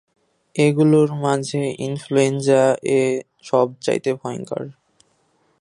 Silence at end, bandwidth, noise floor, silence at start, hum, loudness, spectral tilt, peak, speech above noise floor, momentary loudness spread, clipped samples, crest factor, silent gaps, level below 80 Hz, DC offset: 0.9 s; 11.5 kHz; -63 dBFS; 0.55 s; none; -19 LUFS; -6 dB/octave; -2 dBFS; 44 dB; 12 LU; under 0.1%; 18 dB; none; -66 dBFS; under 0.1%